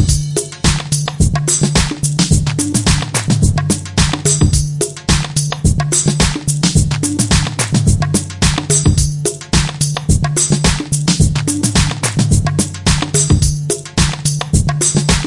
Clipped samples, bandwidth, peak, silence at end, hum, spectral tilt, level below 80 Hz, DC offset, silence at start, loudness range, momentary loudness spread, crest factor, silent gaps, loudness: under 0.1%; 11.5 kHz; 0 dBFS; 0 s; none; -4 dB/octave; -24 dBFS; under 0.1%; 0 s; 1 LU; 4 LU; 14 dB; none; -14 LUFS